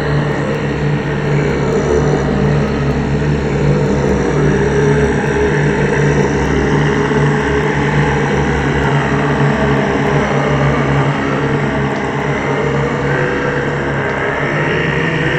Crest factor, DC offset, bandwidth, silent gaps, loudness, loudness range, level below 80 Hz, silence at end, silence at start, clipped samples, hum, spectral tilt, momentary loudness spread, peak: 14 dB; under 0.1%; 8.6 kHz; none; -14 LUFS; 2 LU; -28 dBFS; 0 s; 0 s; under 0.1%; none; -7 dB/octave; 3 LU; 0 dBFS